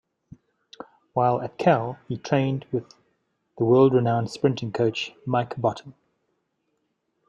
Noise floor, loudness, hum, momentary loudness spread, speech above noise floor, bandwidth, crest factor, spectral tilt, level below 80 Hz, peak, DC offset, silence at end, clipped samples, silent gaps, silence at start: -74 dBFS; -24 LUFS; none; 14 LU; 52 dB; 8.8 kHz; 20 dB; -7.5 dB/octave; -66 dBFS; -6 dBFS; under 0.1%; 1.4 s; under 0.1%; none; 0.8 s